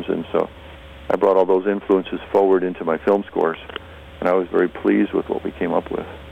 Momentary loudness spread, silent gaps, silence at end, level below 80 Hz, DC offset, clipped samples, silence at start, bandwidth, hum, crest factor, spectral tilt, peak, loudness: 15 LU; none; 0 s; -48 dBFS; under 0.1%; under 0.1%; 0 s; 5.6 kHz; none; 16 dB; -8 dB/octave; -4 dBFS; -20 LUFS